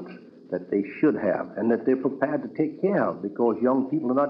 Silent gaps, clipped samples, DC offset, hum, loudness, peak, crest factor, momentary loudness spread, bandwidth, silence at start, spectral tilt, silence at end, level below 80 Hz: none; under 0.1%; under 0.1%; none; -25 LUFS; -10 dBFS; 14 dB; 5 LU; 5.4 kHz; 0 s; -11 dB/octave; 0 s; -74 dBFS